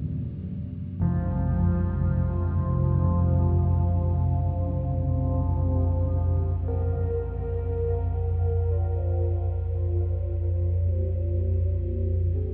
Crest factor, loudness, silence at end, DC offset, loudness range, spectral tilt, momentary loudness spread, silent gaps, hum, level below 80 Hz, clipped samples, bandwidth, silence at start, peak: 12 dB; -26 LUFS; 0 s; under 0.1%; 3 LU; -12.5 dB/octave; 5 LU; none; none; -32 dBFS; under 0.1%; 2 kHz; 0 s; -12 dBFS